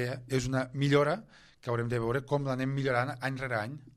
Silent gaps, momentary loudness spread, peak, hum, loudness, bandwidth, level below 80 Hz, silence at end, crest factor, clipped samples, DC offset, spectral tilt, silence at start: none; 8 LU; -14 dBFS; none; -31 LUFS; 13 kHz; -58 dBFS; 0.05 s; 18 dB; under 0.1%; under 0.1%; -6.5 dB/octave; 0 s